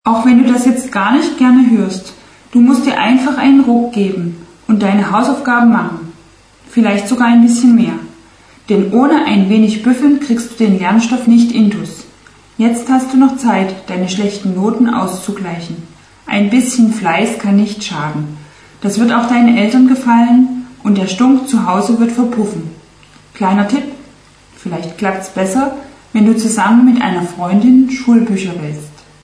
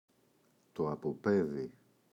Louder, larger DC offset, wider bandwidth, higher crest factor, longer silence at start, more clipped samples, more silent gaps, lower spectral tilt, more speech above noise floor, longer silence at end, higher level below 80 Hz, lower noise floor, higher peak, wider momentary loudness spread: first, -12 LUFS vs -35 LUFS; neither; first, 11 kHz vs 7.8 kHz; second, 12 dB vs 18 dB; second, 0.05 s vs 0.75 s; neither; neither; second, -5.5 dB/octave vs -8.5 dB/octave; second, 32 dB vs 37 dB; about the same, 0.35 s vs 0.45 s; first, -52 dBFS vs -70 dBFS; second, -43 dBFS vs -71 dBFS; first, 0 dBFS vs -18 dBFS; about the same, 14 LU vs 14 LU